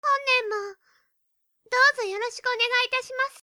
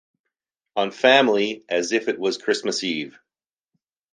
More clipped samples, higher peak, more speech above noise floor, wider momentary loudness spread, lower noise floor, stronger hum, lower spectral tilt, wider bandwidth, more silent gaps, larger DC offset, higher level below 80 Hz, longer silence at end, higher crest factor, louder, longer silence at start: neither; second, -8 dBFS vs 0 dBFS; second, 48 dB vs over 69 dB; about the same, 11 LU vs 12 LU; second, -73 dBFS vs under -90 dBFS; neither; second, 1 dB/octave vs -3 dB/octave; first, over 20 kHz vs 9.8 kHz; neither; neither; about the same, -78 dBFS vs -74 dBFS; second, 0.15 s vs 1 s; about the same, 18 dB vs 22 dB; about the same, -23 LUFS vs -21 LUFS; second, 0.05 s vs 0.75 s